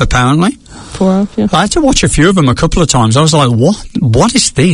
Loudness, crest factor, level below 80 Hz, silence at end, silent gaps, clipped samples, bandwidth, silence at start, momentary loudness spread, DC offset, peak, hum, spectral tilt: -10 LUFS; 10 dB; -24 dBFS; 0 s; none; 0.3%; 11 kHz; 0 s; 6 LU; under 0.1%; 0 dBFS; none; -5 dB/octave